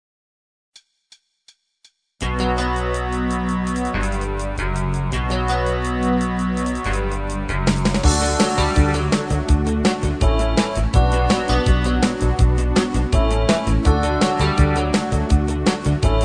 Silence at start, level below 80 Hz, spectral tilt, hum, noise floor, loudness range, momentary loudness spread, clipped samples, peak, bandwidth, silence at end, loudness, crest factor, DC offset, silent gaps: 2.2 s; -22 dBFS; -5.5 dB/octave; none; -58 dBFS; 5 LU; 6 LU; under 0.1%; -2 dBFS; 10 kHz; 0 s; -20 LUFS; 16 dB; 0.2%; none